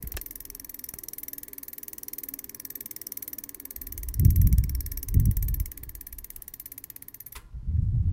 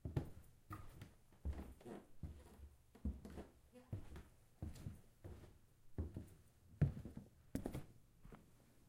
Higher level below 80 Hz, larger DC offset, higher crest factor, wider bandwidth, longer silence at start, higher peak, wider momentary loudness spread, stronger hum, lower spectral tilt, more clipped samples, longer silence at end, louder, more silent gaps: first, -32 dBFS vs -58 dBFS; neither; about the same, 22 dB vs 26 dB; about the same, 17 kHz vs 16 kHz; about the same, 0 s vs 0.05 s; first, -6 dBFS vs -26 dBFS; about the same, 17 LU vs 17 LU; neither; second, -6 dB/octave vs -8 dB/octave; neither; about the same, 0 s vs 0 s; first, -30 LUFS vs -51 LUFS; neither